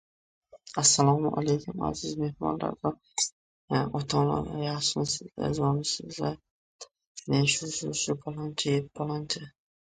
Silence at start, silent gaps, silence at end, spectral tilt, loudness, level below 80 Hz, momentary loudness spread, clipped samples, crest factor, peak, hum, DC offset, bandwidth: 0.55 s; 3.32-3.68 s, 6.51-6.79 s, 7.07-7.15 s; 0.5 s; -4 dB/octave; -29 LUFS; -56 dBFS; 10 LU; under 0.1%; 20 dB; -10 dBFS; none; under 0.1%; 9.6 kHz